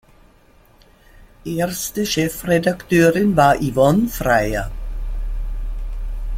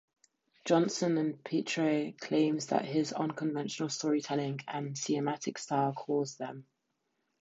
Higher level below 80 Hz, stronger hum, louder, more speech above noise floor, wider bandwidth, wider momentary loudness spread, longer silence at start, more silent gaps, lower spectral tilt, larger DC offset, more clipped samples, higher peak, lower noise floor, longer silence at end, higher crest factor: first, -28 dBFS vs -82 dBFS; neither; first, -18 LUFS vs -33 LUFS; second, 34 dB vs 49 dB; first, 16.5 kHz vs 8 kHz; first, 16 LU vs 8 LU; first, 1.2 s vs 0.65 s; neither; about the same, -5.5 dB/octave vs -5 dB/octave; neither; neither; first, -2 dBFS vs -14 dBFS; second, -51 dBFS vs -81 dBFS; second, 0 s vs 0.8 s; about the same, 18 dB vs 20 dB